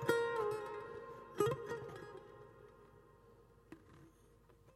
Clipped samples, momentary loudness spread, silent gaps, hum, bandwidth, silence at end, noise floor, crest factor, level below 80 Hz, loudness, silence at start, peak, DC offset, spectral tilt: under 0.1%; 26 LU; none; none; 15.5 kHz; 0.05 s; -66 dBFS; 26 dB; -72 dBFS; -41 LUFS; 0 s; -18 dBFS; under 0.1%; -5.5 dB/octave